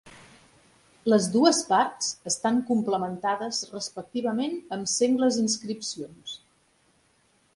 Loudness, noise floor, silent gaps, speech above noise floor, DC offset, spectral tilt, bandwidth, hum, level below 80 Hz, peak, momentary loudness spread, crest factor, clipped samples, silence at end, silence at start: -26 LUFS; -65 dBFS; none; 40 dB; under 0.1%; -3.5 dB/octave; 11.5 kHz; none; -70 dBFS; -6 dBFS; 13 LU; 22 dB; under 0.1%; 1.2 s; 0.05 s